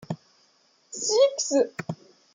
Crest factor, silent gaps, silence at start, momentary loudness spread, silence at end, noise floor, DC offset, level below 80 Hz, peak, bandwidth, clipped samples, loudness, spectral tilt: 18 dB; none; 0 s; 18 LU; 0.4 s; -64 dBFS; under 0.1%; -74 dBFS; -10 dBFS; 9.6 kHz; under 0.1%; -24 LUFS; -3.5 dB/octave